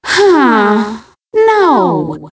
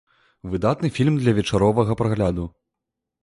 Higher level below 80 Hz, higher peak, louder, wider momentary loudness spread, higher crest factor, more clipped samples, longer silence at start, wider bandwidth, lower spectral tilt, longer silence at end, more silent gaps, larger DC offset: second, -50 dBFS vs -42 dBFS; first, 0 dBFS vs -6 dBFS; first, -10 LUFS vs -21 LUFS; about the same, 11 LU vs 12 LU; second, 10 dB vs 16 dB; neither; second, 0.05 s vs 0.45 s; second, 8 kHz vs 11.5 kHz; second, -5 dB/octave vs -7.5 dB/octave; second, 0.05 s vs 0.75 s; neither; neither